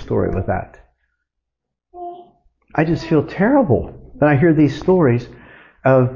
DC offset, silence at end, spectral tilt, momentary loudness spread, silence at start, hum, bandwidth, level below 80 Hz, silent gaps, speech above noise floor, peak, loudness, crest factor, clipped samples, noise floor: under 0.1%; 0 s; -9 dB/octave; 20 LU; 0 s; none; 7.2 kHz; -40 dBFS; none; 65 dB; -2 dBFS; -17 LUFS; 14 dB; under 0.1%; -80 dBFS